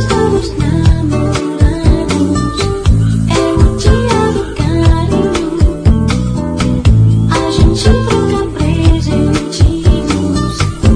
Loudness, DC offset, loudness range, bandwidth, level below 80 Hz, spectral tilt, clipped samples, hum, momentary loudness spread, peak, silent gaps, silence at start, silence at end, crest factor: -12 LUFS; under 0.1%; 1 LU; 10.5 kHz; -16 dBFS; -6.5 dB/octave; 0.6%; none; 4 LU; 0 dBFS; none; 0 s; 0 s; 10 dB